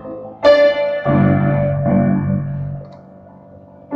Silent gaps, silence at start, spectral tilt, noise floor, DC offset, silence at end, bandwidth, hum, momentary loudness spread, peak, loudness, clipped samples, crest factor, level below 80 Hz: none; 0 s; -9 dB/octave; -41 dBFS; under 0.1%; 0 s; 6.6 kHz; none; 15 LU; 0 dBFS; -15 LUFS; under 0.1%; 16 dB; -42 dBFS